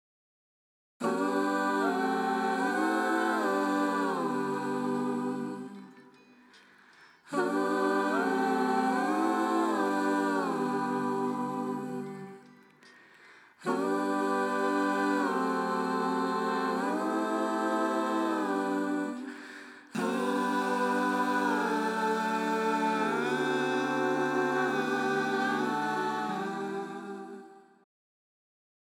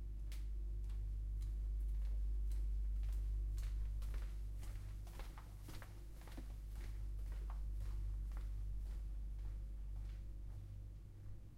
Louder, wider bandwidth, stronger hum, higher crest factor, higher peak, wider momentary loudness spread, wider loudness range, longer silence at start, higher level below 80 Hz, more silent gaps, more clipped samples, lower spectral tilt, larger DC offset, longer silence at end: first, -30 LUFS vs -48 LUFS; first, 17 kHz vs 12.5 kHz; second, none vs 50 Hz at -45 dBFS; about the same, 14 dB vs 10 dB; first, -16 dBFS vs -34 dBFS; about the same, 8 LU vs 10 LU; about the same, 5 LU vs 6 LU; first, 1 s vs 0 s; second, under -90 dBFS vs -44 dBFS; neither; neither; second, -5 dB/octave vs -6.5 dB/octave; neither; first, 1.25 s vs 0 s